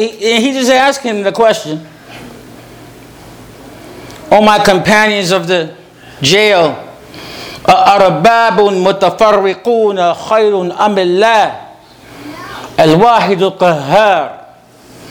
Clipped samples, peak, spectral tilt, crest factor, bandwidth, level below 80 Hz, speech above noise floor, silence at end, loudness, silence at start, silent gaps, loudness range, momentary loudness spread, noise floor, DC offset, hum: 0.6%; 0 dBFS; -4.5 dB/octave; 12 dB; over 20 kHz; -46 dBFS; 30 dB; 0 s; -10 LUFS; 0 s; none; 5 LU; 20 LU; -39 dBFS; under 0.1%; none